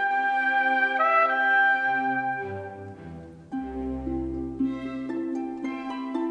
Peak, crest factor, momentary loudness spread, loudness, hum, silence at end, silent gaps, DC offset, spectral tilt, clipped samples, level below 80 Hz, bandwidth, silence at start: -10 dBFS; 16 dB; 17 LU; -25 LUFS; none; 0 s; none; under 0.1%; -6.5 dB/octave; under 0.1%; -48 dBFS; 8.6 kHz; 0 s